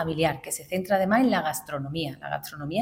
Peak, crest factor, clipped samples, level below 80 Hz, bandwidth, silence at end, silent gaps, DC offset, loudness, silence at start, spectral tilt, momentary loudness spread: -10 dBFS; 16 dB; under 0.1%; -56 dBFS; 17 kHz; 0 s; none; under 0.1%; -27 LUFS; 0 s; -5 dB/octave; 11 LU